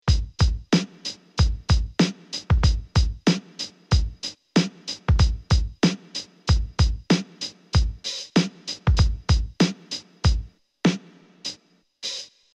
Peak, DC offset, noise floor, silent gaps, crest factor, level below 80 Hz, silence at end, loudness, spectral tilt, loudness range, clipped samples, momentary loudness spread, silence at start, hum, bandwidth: -6 dBFS; under 0.1%; -55 dBFS; none; 16 dB; -28 dBFS; 0.3 s; -24 LUFS; -5.5 dB/octave; 1 LU; under 0.1%; 13 LU; 0.05 s; none; 10 kHz